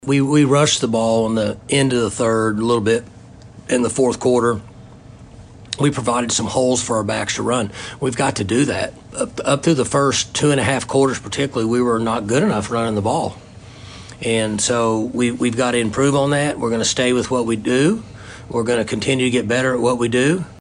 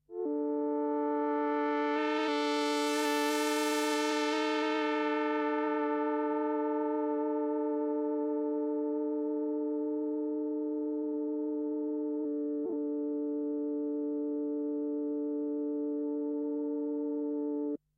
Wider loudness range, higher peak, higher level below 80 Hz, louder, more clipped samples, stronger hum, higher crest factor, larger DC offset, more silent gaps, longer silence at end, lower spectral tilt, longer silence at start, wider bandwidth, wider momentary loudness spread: about the same, 3 LU vs 4 LU; first, -2 dBFS vs -18 dBFS; first, -48 dBFS vs -82 dBFS; first, -18 LUFS vs -33 LUFS; neither; second, none vs 50 Hz at -80 dBFS; about the same, 16 dB vs 14 dB; neither; neither; second, 0 s vs 0.2 s; first, -4.5 dB/octave vs -2.5 dB/octave; about the same, 0.05 s vs 0.1 s; second, 10.5 kHz vs 16 kHz; first, 7 LU vs 4 LU